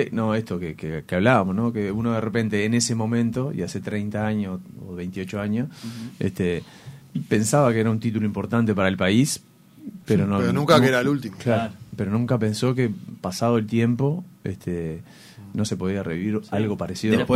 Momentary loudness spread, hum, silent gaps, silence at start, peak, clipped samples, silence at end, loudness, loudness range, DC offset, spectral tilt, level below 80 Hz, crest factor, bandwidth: 13 LU; none; none; 0 s; -4 dBFS; under 0.1%; 0 s; -23 LUFS; 6 LU; under 0.1%; -6 dB/octave; -54 dBFS; 20 dB; 15.5 kHz